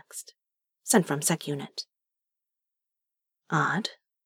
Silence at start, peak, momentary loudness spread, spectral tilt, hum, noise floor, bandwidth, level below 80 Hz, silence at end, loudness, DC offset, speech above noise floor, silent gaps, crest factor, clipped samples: 0.15 s; -6 dBFS; 18 LU; -3.5 dB/octave; none; -87 dBFS; 18 kHz; -88 dBFS; 0.3 s; -27 LUFS; under 0.1%; 60 dB; none; 26 dB; under 0.1%